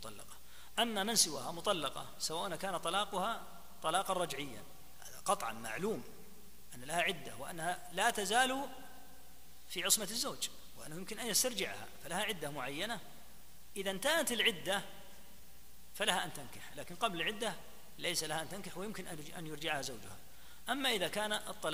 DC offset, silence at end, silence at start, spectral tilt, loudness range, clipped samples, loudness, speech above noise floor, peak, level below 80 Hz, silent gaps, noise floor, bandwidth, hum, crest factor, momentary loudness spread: 0.4%; 0 s; 0 s; -1.5 dB/octave; 4 LU; under 0.1%; -36 LUFS; 22 dB; -14 dBFS; -64 dBFS; none; -60 dBFS; 15.5 kHz; none; 24 dB; 22 LU